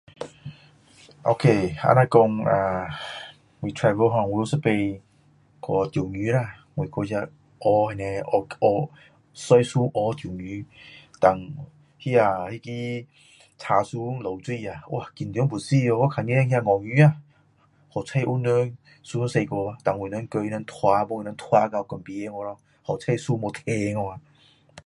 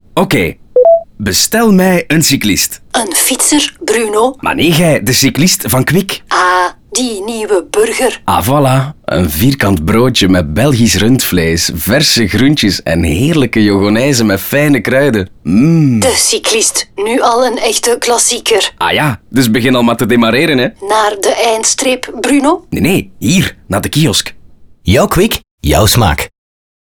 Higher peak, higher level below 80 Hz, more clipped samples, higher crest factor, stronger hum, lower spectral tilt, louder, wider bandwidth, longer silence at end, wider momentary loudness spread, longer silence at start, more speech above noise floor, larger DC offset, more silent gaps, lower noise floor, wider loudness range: about the same, -2 dBFS vs 0 dBFS; second, -56 dBFS vs -32 dBFS; neither; first, 22 dB vs 10 dB; neither; first, -7 dB/octave vs -4 dB/octave; second, -24 LUFS vs -10 LUFS; second, 11.5 kHz vs over 20 kHz; second, 0.05 s vs 0.7 s; first, 16 LU vs 5 LU; about the same, 0.2 s vs 0.15 s; first, 37 dB vs 27 dB; second, under 0.1% vs 0.6%; second, none vs 25.51-25.58 s; first, -60 dBFS vs -37 dBFS; about the same, 4 LU vs 2 LU